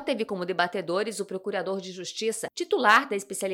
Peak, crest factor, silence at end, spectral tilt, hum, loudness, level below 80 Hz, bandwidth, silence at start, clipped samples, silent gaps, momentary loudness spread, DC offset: -6 dBFS; 20 dB; 0 s; -3 dB/octave; none; -27 LUFS; -74 dBFS; 18 kHz; 0 s; under 0.1%; none; 13 LU; under 0.1%